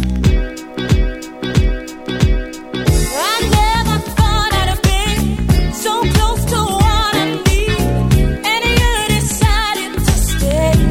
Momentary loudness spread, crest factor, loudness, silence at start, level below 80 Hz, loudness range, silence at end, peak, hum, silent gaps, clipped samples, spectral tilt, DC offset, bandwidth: 5 LU; 14 dB; -15 LUFS; 0 s; -18 dBFS; 2 LU; 0 s; 0 dBFS; none; none; under 0.1%; -4.5 dB/octave; under 0.1%; 17 kHz